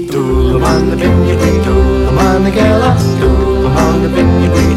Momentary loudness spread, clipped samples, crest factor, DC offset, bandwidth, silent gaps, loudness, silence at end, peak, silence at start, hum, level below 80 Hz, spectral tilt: 2 LU; under 0.1%; 8 dB; under 0.1%; 14.5 kHz; none; -11 LUFS; 0 s; -2 dBFS; 0 s; none; -16 dBFS; -7 dB/octave